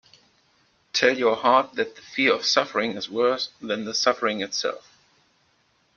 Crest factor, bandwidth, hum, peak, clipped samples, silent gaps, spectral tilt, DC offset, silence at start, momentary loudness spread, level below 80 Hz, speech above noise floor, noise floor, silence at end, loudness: 20 dB; 7.2 kHz; none; -4 dBFS; under 0.1%; none; -2.5 dB/octave; under 0.1%; 0.95 s; 9 LU; -70 dBFS; 42 dB; -65 dBFS; 1.15 s; -23 LUFS